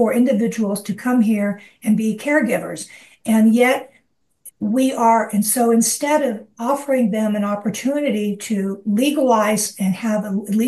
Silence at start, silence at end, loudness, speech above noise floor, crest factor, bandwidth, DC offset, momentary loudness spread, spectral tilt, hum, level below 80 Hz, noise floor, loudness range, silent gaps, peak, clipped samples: 0 s; 0 s; -18 LUFS; 43 dB; 14 dB; 13 kHz; under 0.1%; 8 LU; -5 dB/octave; none; -68 dBFS; -61 dBFS; 2 LU; none; -4 dBFS; under 0.1%